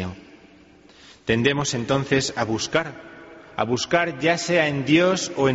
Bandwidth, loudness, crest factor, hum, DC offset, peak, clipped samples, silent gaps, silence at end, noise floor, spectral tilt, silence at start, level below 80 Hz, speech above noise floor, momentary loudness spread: 8 kHz; -21 LUFS; 18 dB; none; under 0.1%; -4 dBFS; under 0.1%; none; 0 s; -51 dBFS; -4 dB/octave; 0 s; -52 dBFS; 29 dB; 15 LU